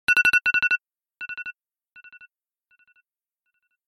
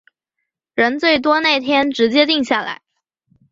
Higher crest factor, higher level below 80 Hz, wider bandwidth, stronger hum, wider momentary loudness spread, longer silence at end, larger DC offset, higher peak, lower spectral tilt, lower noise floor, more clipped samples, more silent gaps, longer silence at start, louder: first, 22 dB vs 16 dB; about the same, -64 dBFS vs -60 dBFS; first, 13 kHz vs 7.6 kHz; neither; first, 20 LU vs 11 LU; first, 2.35 s vs 0.75 s; neither; about the same, -4 dBFS vs -2 dBFS; second, -0.5 dB/octave vs -3.5 dB/octave; first, -82 dBFS vs -78 dBFS; neither; neither; second, 0.1 s vs 0.75 s; second, -20 LUFS vs -15 LUFS